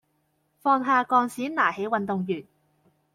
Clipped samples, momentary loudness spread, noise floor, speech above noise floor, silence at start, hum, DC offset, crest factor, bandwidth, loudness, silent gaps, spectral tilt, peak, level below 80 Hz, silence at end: under 0.1%; 9 LU; -71 dBFS; 47 dB; 0.65 s; none; under 0.1%; 20 dB; 15.5 kHz; -25 LUFS; none; -6 dB/octave; -8 dBFS; -72 dBFS; 0.7 s